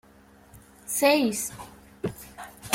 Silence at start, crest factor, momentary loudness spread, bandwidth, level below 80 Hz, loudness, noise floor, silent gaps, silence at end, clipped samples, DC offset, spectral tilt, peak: 0.55 s; 22 dB; 23 LU; 16.5 kHz; -58 dBFS; -26 LUFS; -54 dBFS; none; 0 s; under 0.1%; under 0.1%; -3 dB/octave; -6 dBFS